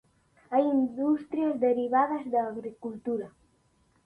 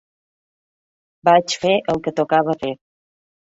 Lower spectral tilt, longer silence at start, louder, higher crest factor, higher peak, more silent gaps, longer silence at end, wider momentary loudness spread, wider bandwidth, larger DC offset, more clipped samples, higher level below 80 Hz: first, -8 dB/octave vs -4.5 dB/octave; second, 0.5 s vs 1.25 s; second, -28 LUFS vs -18 LUFS; about the same, 18 dB vs 20 dB; second, -12 dBFS vs -2 dBFS; neither; about the same, 0.75 s vs 0.65 s; about the same, 12 LU vs 10 LU; second, 4.6 kHz vs 7.8 kHz; neither; neither; second, -72 dBFS vs -58 dBFS